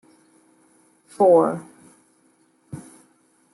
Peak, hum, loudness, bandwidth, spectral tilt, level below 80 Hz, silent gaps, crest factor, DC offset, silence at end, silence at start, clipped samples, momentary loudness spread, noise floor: -6 dBFS; none; -18 LUFS; 12 kHz; -8 dB/octave; -72 dBFS; none; 20 dB; under 0.1%; 0.75 s; 1.2 s; under 0.1%; 25 LU; -61 dBFS